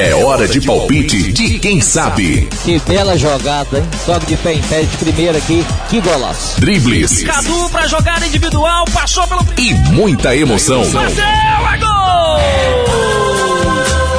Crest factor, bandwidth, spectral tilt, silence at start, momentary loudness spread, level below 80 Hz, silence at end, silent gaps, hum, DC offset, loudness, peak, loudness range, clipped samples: 12 dB; 11 kHz; -4 dB/octave; 0 s; 4 LU; -20 dBFS; 0 s; none; none; under 0.1%; -12 LUFS; 0 dBFS; 3 LU; under 0.1%